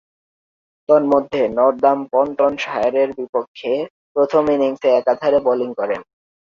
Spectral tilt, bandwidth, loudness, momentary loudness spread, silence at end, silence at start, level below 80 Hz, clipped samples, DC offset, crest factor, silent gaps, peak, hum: -6 dB/octave; 7.2 kHz; -18 LUFS; 9 LU; 0.45 s; 0.9 s; -58 dBFS; under 0.1%; under 0.1%; 16 dB; 3.29-3.33 s, 3.48-3.55 s, 3.90-4.15 s; -2 dBFS; none